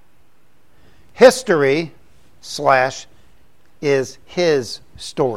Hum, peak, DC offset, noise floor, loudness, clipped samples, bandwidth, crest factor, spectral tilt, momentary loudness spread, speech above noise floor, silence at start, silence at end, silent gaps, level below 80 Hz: none; 0 dBFS; 0.7%; -59 dBFS; -16 LUFS; under 0.1%; 14.5 kHz; 20 dB; -4.5 dB/octave; 19 LU; 43 dB; 1.2 s; 0 s; none; -56 dBFS